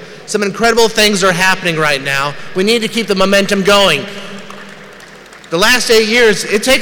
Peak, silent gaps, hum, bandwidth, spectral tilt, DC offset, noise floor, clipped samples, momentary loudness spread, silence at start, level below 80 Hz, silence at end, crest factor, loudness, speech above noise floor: -2 dBFS; none; none; over 20 kHz; -3 dB/octave; under 0.1%; -35 dBFS; under 0.1%; 13 LU; 0 s; -40 dBFS; 0 s; 10 dB; -11 LUFS; 24 dB